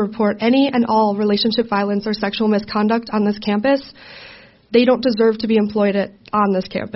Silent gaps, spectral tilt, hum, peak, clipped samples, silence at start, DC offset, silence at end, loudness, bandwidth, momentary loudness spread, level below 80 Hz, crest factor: none; -4.5 dB/octave; none; -2 dBFS; under 0.1%; 0 s; under 0.1%; 0.05 s; -17 LUFS; 6 kHz; 6 LU; -54 dBFS; 16 dB